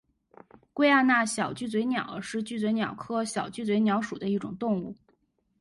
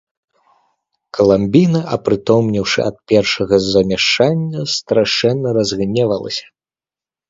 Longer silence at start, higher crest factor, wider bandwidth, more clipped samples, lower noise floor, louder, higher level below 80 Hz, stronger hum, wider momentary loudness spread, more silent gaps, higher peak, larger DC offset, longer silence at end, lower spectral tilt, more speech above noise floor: second, 0.75 s vs 1.15 s; about the same, 18 dB vs 16 dB; first, 11.5 kHz vs 7.8 kHz; neither; second, -71 dBFS vs under -90 dBFS; second, -27 LUFS vs -15 LUFS; second, -68 dBFS vs -46 dBFS; neither; first, 11 LU vs 7 LU; neither; second, -10 dBFS vs 0 dBFS; neither; second, 0.65 s vs 0.9 s; about the same, -4.5 dB/octave vs -5.5 dB/octave; second, 44 dB vs over 75 dB